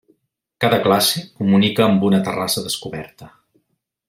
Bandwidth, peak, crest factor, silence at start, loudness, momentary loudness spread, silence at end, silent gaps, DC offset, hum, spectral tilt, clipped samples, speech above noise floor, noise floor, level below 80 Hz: 16 kHz; -2 dBFS; 18 dB; 0.6 s; -17 LUFS; 12 LU; 0.8 s; none; under 0.1%; none; -4.5 dB/octave; under 0.1%; 54 dB; -71 dBFS; -58 dBFS